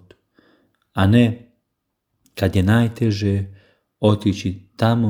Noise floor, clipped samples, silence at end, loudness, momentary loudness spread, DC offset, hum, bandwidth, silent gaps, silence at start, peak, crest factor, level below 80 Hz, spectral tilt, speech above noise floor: -76 dBFS; under 0.1%; 0 s; -19 LUFS; 14 LU; under 0.1%; none; 15.5 kHz; none; 0.95 s; -2 dBFS; 18 dB; -50 dBFS; -7.5 dB/octave; 59 dB